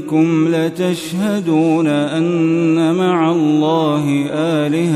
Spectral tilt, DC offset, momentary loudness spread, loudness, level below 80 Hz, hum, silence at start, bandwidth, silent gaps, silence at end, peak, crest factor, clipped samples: -7 dB/octave; under 0.1%; 4 LU; -15 LUFS; -62 dBFS; none; 0 s; 13.5 kHz; none; 0 s; -2 dBFS; 12 dB; under 0.1%